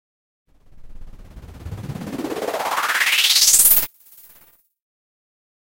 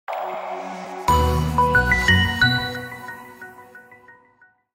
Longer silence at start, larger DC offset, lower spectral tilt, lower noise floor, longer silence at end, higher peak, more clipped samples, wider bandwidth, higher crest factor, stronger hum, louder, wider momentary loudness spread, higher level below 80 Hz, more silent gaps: first, 0.75 s vs 0.1 s; neither; second, 0 dB/octave vs -4.5 dB/octave; about the same, -54 dBFS vs -57 dBFS; first, 1.95 s vs 0.65 s; first, 0 dBFS vs -4 dBFS; neither; about the same, 17 kHz vs 16 kHz; about the same, 22 dB vs 18 dB; neither; first, -15 LUFS vs -19 LUFS; about the same, 21 LU vs 21 LU; second, -44 dBFS vs -32 dBFS; neither